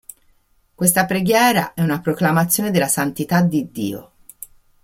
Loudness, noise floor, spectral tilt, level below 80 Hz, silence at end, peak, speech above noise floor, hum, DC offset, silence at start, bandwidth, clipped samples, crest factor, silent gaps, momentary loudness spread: -18 LUFS; -58 dBFS; -4.5 dB/octave; -56 dBFS; 0.8 s; 0 dBFS; 40 dB; none; under 0.1%; 0.8 s; 16.5 kHz; under 0.1%; 20 dB; none; 20 LU